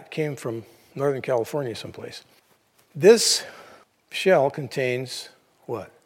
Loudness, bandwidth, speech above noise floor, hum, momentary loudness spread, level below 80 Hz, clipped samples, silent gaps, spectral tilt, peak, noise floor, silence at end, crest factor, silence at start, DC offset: -23 LUFS; 16.5 kHz; 39 dB; none; 23 LU; -74 dBFS; under 0.1%; none; -3.5 dB/octave; -2 dBFS; -62 dBFS; 0.2 s; 22 dB; 0 s; under 0.1%